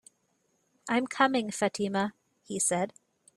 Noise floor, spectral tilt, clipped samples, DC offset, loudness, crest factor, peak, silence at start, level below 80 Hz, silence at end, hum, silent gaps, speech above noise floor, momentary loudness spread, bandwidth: -74 dBFS; -3.5 dB/octave; under 0.1%; under 0.1%; -29 LUFS; 20 dB; -12 dBFS; 0.85 s; -74 dBFS; 0.45 s; none; none; 45 dB; 10 LU; 14.5 kHz